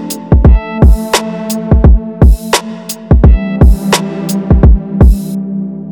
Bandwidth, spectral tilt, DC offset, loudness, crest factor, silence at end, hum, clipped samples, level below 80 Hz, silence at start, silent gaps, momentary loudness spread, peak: 20 kHz; -6 dB/octave; under 0.1%; -10 LUFS; 8 dB; 0 s; none; 7%; -10 dBFS; 0 s; none; 10 LU; 0 dBFS